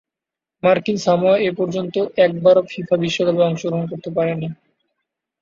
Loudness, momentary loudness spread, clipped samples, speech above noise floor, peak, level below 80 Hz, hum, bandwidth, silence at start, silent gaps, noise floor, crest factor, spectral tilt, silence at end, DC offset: -18 LUFS; 8 LU; under 0.1%; 69 dB; -2 dBFS; -60 dBFS; none; 7.4 kHz; 0.65 s; none; -87 dBFS; 16 dB; -6 dB/octave; 0.85 s; under 0.1%